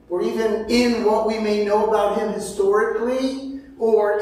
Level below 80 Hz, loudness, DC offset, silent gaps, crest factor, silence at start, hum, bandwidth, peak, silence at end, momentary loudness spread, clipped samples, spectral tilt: -50 dBFS; -20 LUFS; under 0.1%; none; 14 dB; 0.1 s; none; 15 kHz; -6 dBFS; 0 s; 7 LU; under 0.1%; -4.5 dB/octave